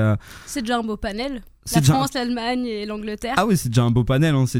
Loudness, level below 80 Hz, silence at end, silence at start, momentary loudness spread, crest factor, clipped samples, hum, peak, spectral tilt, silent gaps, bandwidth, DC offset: -21 LUFS; -40 dBFS; 0 s; 0 s; 10 LU; 18 dB; under 0.1%; none; -2 dBFS; -5.5 dB/octave; none; 16.5 kHz; under 0.1%